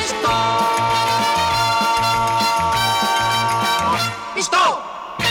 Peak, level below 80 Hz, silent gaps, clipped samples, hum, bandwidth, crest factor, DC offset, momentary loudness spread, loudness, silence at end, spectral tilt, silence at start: -6 dBFS; -44 dBFS; none; under 0.1%; none; 19.5 kHz; 12 dB; under 0.1%; 4 LU; -17 LUFS; 0 s; -2.5 dB/octave; 0 s